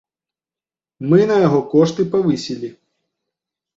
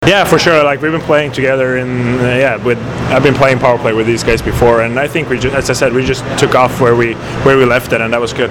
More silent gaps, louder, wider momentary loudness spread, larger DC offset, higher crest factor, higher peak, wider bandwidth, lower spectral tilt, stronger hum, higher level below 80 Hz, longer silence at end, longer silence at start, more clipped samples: neither; second, -16 LUFS vs -11 LUFS; first, 15 LU vs 6 LU; neither; first, 16 dB vs 10 dB; about the same, -2 dBFS vs 0 dBFS; second, 7.8 kHz vs 19.5 kHz; first, -7.5 dB/octave vs -5.5 dB/octave; neither; second, -58 dBFS vs -32 dBFS; first, 1.05 s vs 0 s; first, 1 s vs 0 s; neither